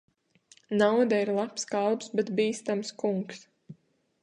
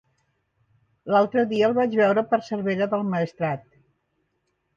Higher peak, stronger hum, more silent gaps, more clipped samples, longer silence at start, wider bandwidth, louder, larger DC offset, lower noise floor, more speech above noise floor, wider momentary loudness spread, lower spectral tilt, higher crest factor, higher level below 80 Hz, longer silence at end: about the same, -10 dBFS vs -8 dBFS; neither; neither; neither; second, 0.7 s vs 1.05 s; first, 10.5 kHz vs 7.4 kHz; second, -28 LUFS vs -23 LUFS; neither; second, -63 dBFS vs -74 dBFS; second, 35 dB vs 52 dB; about the same, 9 LU vs 8 LU; second, -5 dB/octave vs -7.5 dB/octave; about the same, 18 dB vs 18 dB; second, -76 dBFS vs -68 dBFS; second, 0.5 s vs 1.15 s